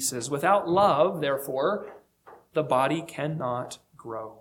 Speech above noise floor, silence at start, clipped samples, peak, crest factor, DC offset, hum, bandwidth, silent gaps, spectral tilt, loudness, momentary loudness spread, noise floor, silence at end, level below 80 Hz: 28 dB; 0 s; under 0.1%; -8 dBFS; 18 dB; under 0.1%; none; 18.5 kHz; none; -4.5 dB/octave; -26 LUFS; 16 LU; -54 dBFS; 0.05 s; -66 dBFS